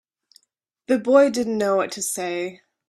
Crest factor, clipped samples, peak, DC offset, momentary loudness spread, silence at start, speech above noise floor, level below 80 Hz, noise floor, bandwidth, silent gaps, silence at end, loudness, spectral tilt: 20 dB; under 0.1%; -4 dBFS; under 0.1%; 11 LU; 0.9 s; 53 dB; -68 dBFS; -73 dBFS; 14 kHz; none; 0.35 s; -21 LUFS; -4 dB/octave